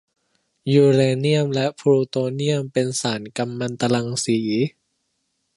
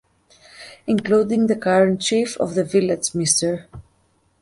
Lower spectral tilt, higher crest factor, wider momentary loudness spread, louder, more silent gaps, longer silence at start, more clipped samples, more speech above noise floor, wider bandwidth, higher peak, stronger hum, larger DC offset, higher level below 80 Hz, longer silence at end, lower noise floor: first, -5.5 dB/octave vs -4 dB/octave; about the same, 18 dB vs 18 dB; about the same, 10 LU vs 12 LU; about the same, -21 LUFS vs -19 LUFS; neither; about the same, 0.65 s vs 0.6 s; neither; first, 53 dB vs 43 dB; about the same, 11.5 kHz vs 11.5 kHz; about the same, -4 dBFS vs -4 dBFS; neither; neither; second, -66 dBFS vs -56 dBFS; first, 0.85 s vs 0.6 s; first, -72 dBFS vs -62 dBFS